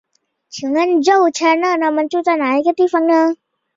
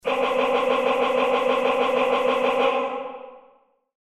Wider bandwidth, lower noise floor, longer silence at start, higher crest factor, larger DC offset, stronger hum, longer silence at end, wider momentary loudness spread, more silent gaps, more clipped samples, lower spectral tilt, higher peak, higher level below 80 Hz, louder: second, 7.6 kHz vs 13 kHz; second, -48 dBFS vs -59 dBFS; first, 0.55 s vs 0.05 s; about the same, 14 dB vs 14 dB; neither; neither; second, 0.45 s vs 0.65 s; about the same, 7 LU vs 8 LU; neither; neither; about the same, -3 dB/octave vs -4 dB/octave; first, -2 dBFS vs -10 dBFS; second, -66 dBFS vs -60 dBFS; first, -15 LUFS vs -21 LUFS